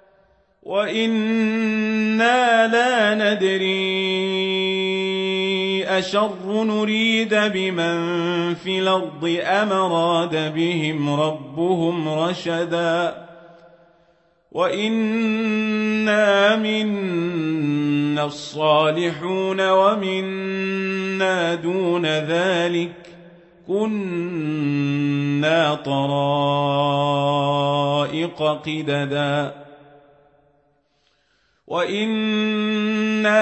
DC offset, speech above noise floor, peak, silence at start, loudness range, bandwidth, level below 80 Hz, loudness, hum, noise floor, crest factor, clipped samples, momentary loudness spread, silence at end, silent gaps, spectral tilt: under 0.1%; 45 dB; -4 dBFS; 0.65 s; 6 LU; 8.4 kHz; -66 dBFS; -20 LUFS; none; -65 dBFS; 16 dB; under 0.1%; 7 LU; 0 s; none; -5.5 dB/octave